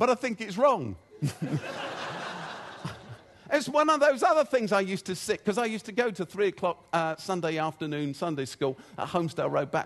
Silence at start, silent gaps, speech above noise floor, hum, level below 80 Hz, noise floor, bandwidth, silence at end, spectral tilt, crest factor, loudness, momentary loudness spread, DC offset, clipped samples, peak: 0 s; none; 20 dB; none; -68 dBFS; -48 dBFS; 12.5 kHz; 0 s; -5 dB/octave; 18 dB; -28 LUFS; 14 LU; under 0.1%; under 0.1%; -10 dBFS